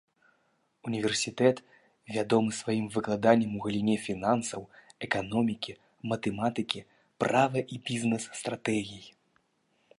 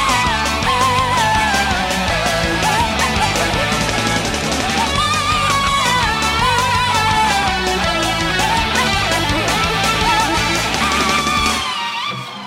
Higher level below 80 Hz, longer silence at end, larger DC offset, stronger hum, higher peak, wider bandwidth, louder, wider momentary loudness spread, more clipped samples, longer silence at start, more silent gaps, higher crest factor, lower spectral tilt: second, -66 dBFS vs -30 dBFS; first, 0.9 s vs 0 s; neither; neither; second, -8 dBFS vs 0 dBFS; second, 11.5 kHz vs 17 kHz; second, -30 LUFS vs -15 LUFS; first, 12 LU vs 3 LU; neither; first, 0.85 s vs 0 s; neither; first, 22 dB vs 16 dB; first, -5 dB/octave vs -3 dB/octave